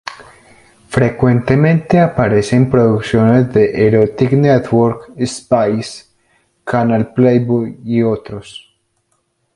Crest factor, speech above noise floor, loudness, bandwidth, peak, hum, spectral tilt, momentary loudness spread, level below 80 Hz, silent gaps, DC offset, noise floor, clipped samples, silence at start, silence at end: 14 dB; 52 dB; -13 LUFS; 11.5 kHz; 0 dBFS; none; -7.5 dB/octave; 11 LU; -42 dBFS; none; under 0.1%; -64 dBFS; under 0.1%; 0.05 s; 1 s